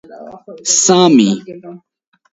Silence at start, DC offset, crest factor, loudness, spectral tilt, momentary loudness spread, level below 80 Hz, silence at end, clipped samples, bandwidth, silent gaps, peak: 0.1 s; under 0.1%; 14 dB; -11 LUFS; -3.5 dB/octave; 24 LU; -60 dBFS; 0.55 s; under 0.1%; 8.2 kHz; none; 0 dBFS